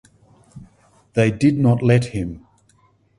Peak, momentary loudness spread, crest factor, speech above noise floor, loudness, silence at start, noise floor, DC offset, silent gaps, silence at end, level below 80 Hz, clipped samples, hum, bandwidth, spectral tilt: -2 dBFS; 14 LU; 20 dB; 41 dB; -18 LUFS; 0.55 s; -58 dBFS; under 0.1%; none; 0.8 s; -46 dBFS; under 0.1%; none; 11 kHz; -8 dB/octave